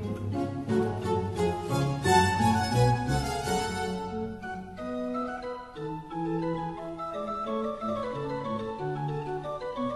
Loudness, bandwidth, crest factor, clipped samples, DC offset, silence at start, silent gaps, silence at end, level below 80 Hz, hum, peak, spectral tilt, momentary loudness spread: -30 LUFS; 12.5 kHz; 20 dB; under 0.1%; under 0.1%; 0 s; none; 0 s; -48 dBFS; none; -8 dBFS; -6 dB/octave; 12 LU